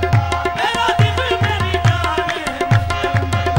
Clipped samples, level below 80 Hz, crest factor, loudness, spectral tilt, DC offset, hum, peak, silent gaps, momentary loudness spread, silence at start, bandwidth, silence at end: under 0.1%; -32 dBFS; 14 dB; -17 LUFS; -5.5 dB/octave; under 0.1%; none; -2 dBFS; none; 4 LU; 0 s; 16.5 kHz; 0 s